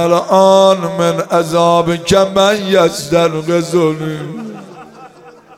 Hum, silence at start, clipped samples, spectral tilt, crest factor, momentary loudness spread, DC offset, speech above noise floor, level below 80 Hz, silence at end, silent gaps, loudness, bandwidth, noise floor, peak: none; 0 s; under 0.1%; -5 dB/octave; 12 dB; 14 LU; under 0.1%; 28 dB; -48 dBFS; 0.25 s; none; -12 LUFS; 16 kHz; -39 dBFS; 0 dBFS